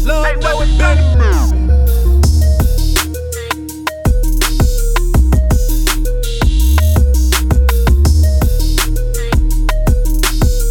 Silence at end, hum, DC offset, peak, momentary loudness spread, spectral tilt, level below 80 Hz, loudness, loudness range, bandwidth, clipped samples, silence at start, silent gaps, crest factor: 0 s; none; under 0.1%; 0 dBFS; 6 LU; -5 dB/octave; -12 dBFS; -14 LUFS; 2 LU; 17.5 kHz; under 0.1%; 0 s; none; 10 dB